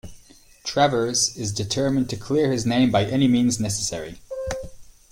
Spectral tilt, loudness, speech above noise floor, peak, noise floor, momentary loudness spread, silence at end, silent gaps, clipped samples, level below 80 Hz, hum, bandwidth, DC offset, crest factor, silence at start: -4.5 dB/octave; -22 LUFS; 29 dB; -6 dBFS; -50 dBFS; 14 LU; 0.3 s; none; under 0.1%; -46 dBFS; none; 16 kHz; under 0.1%; 18 dB; 0.05 s